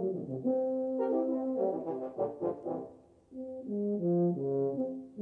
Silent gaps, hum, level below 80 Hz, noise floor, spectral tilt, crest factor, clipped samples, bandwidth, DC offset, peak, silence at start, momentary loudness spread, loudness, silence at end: none; none; -76 dBFS; -54 dBFS; -12 dB/octave; 14 dB; under 0.1%; 3 kHz; under 0.1%; -20 dBFS; 0 s; 11 LU; -33 LUFS; 0 s